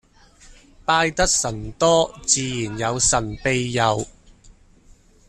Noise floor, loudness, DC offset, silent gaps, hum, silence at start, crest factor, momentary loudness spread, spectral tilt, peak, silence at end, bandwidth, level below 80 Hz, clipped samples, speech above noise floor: -51 dBFS; -20 LUFS; under 0.1%; none; none; 0.5 s; 20 dB; 9 LU; -3 dB/octave; -2 dBFS; 0.8 s; 13.5 kHz; -40 dBFS; under 0.1%; 31 dB